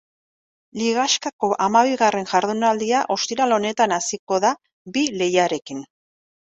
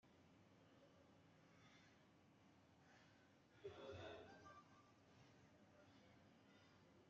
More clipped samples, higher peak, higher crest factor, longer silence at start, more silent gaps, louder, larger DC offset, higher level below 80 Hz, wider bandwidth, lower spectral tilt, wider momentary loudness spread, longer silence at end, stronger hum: neither; first, -2 dBFS vs -44 dBFS; about the same, 18 dB vs 22 dB; first, 0.75 s vs 0.05 s; first, 1.33-1.39 s, 4.19-4.27 s, 4.73-4.85 s vs none; first, -20 LUFS vs -61 LUFS; neither; first, -66 dBFS vs under -90 dBFS; first, 8.4 kHz vs 7.2 kHz; about the same, -3 dB/octave vs -4 dB/octave; about the same, 9 LU vs 10 LU; first, 0.75 s vs 0 s; neither